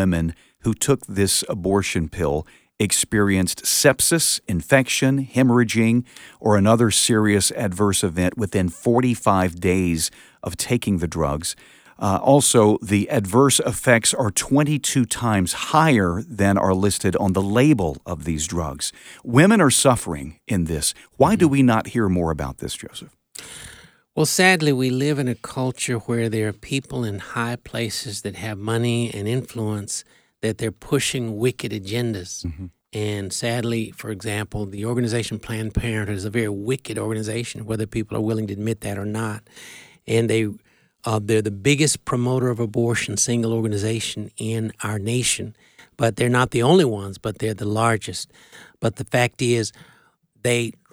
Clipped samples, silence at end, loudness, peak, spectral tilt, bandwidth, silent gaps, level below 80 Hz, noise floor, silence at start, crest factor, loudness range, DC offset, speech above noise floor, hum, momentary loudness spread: under 0.1%; 0.2 s; -21 LUFS; 0 dBFS; -4.5 dB/octave; over 20 kHz; none; -44 dBFS; -59 dBFS; 0 s; 20 dB; 7 LU; under 0.1%; 38 dB; none; 13 LU